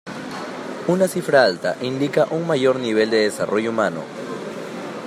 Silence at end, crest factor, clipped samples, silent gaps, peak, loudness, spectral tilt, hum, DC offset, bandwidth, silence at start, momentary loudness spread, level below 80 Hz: 0 s; 20 dB; under 0.1%; none; -2 dBFS; -21 LUFS; -5 dB/octave; none; under 0.1%; 15 kHz; 0.05 s; 14 LU; -68 dBFS